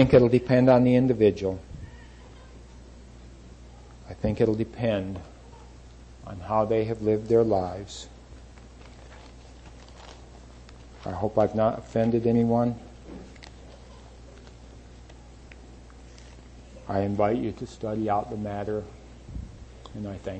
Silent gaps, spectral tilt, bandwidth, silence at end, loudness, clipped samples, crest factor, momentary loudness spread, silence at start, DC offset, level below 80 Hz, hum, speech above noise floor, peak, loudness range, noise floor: none; -8 dB/octave; 8.6 kHz; 0 s; -25 LUFS; under 0.1%; 22 dB; 27 LU; 0 s; under 0.1%; -48 dBFS; none; 23 dB; -6 dBFS; 17 LU; -47 dBFS